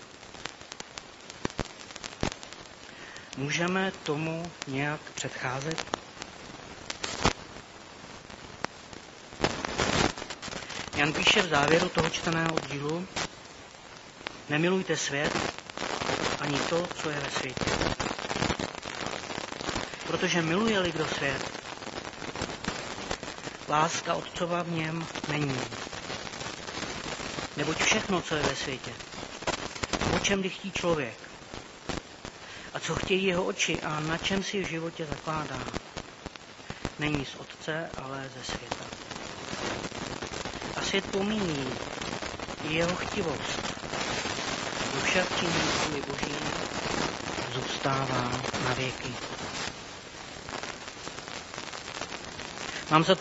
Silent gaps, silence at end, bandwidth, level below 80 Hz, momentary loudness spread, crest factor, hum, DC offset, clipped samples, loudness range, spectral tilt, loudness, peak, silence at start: none; 0 s; 8 kHz; -52 dBFS; 15 LU; 26 dB; none; under 0.1%; under 0.1%; 8 LU; -3 dB/octave; -31 LUFS; -4 dBFS; 0 s